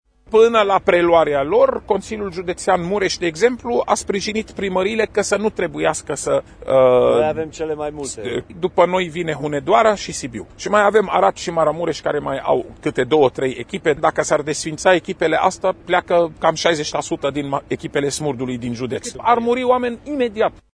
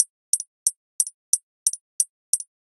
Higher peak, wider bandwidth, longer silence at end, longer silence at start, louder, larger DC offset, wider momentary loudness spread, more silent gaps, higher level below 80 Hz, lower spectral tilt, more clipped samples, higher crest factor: about the same, 0 dBFS vs 0 dBFS; second, 11 kHz vs 14.5 kHz; about the same, 0.25 s vs 0.25 s; first, 0.3 s vs 0 s; first, -18 LUFS vs -24 LUFS; neither; first, 10 LU vs 4 LU; second, none vs 0.10-0.33 s, 0.47-0.66 s, 0.76-0.99 s, 1.14-1.33 s, 1.43-1.66 s, 1.81-1.99 s, 2.09-2.33 s; first, -46 dBFS vs under -90 dBFS; first, -4.5 dB/octave vs 8 dB/octave; neither; second, 18 dB vs 26 dB